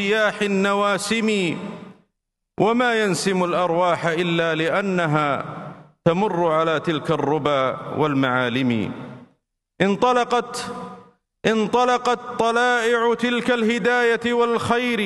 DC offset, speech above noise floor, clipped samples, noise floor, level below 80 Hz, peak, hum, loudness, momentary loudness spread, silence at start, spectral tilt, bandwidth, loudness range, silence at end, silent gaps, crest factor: under 0.1%; 58 dB; under 0.1%; -78 dBFS; -60 dBFS; -2 dBFS; none; -20 LUFS; 10 LU; 0 s; -5 dB/octave; 12.5 kHz; 3 LU; 0 s; none; 20 dB